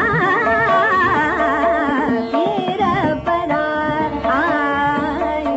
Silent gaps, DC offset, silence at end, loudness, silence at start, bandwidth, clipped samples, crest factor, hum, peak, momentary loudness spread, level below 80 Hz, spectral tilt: none; under 0.1%; 0 s; -17 LUFS; 0 s; 8 kHz; under 0.1%; 12 dB; none; -6 dBFS; 5 LU; -42 dBFS; -3.5 dB/octave